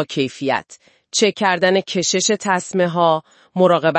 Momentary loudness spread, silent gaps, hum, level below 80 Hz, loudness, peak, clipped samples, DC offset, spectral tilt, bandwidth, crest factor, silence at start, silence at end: 7 LU; none; none; -68 dBFS; -18 LUFS; -2 dBFS; under 0.1%; under 0.1%; -3.5 dB/octave; 8.8 kHz; 16 dB; 0 s; 0 s